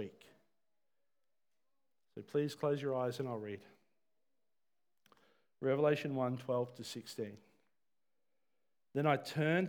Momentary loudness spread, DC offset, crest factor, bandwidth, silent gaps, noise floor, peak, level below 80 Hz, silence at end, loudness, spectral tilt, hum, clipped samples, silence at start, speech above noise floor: 14 LU; under 0.1%; 22 dB; 19 kHz; none; under -90 dBFS; -18 dBFS; under -90 dBFS; 0 s; -38 LUFS; -6.5 dB/octave; none; under 0.1%; 0 s; over 54 dB